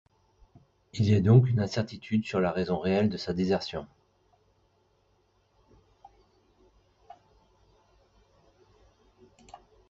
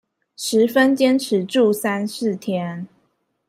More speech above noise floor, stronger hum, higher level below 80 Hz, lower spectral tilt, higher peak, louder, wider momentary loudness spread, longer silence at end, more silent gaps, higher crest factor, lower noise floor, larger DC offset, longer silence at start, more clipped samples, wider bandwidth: second, 43 dB vs 48 dB; neither; first, -54 dBFS vs -68 dBFS; first, -8 dB/octave vs -5 dB/octave; second, -10 dBFS vs -4 dBFS; second, -27 LUFS vs -19 LUFS; about the same, 12 LU vs 13 LU; second, 0.35 s vs 0.65 s; neither; first, 22 dB vs 16 dB; about the same, -69 dBFS vs -67 dBFS; neither; first, 0.95 s vs 0.4 s; neither; second, 7.8 kHz vs 16 kHz